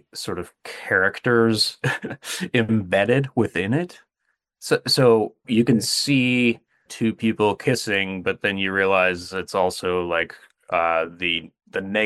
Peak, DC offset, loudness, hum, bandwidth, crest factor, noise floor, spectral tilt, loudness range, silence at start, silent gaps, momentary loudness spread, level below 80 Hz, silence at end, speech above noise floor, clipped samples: -4 dBFS; under 0.1%; -21 LUFS; none; 14 kHz; 18 dB; -75 dBFS; -4.5 dB/octave; 3 LU; 0.15 s; none; 12 LU; -62 dBFS; 0 s; 53 dB; under 0.1%